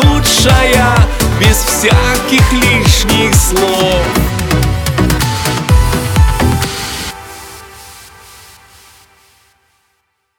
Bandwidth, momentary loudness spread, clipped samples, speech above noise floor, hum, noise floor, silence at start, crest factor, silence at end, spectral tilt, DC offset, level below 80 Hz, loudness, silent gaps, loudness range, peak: 19 kHz; 14 LU; under 0.1%; 54 dB; none; -63 dBFS; 0 s; 12 dB; 2.35 s; -4 dB/octave; under 0.1%; -18 dBFS; -10 LUFS; none; 11 LU; 0 dBFS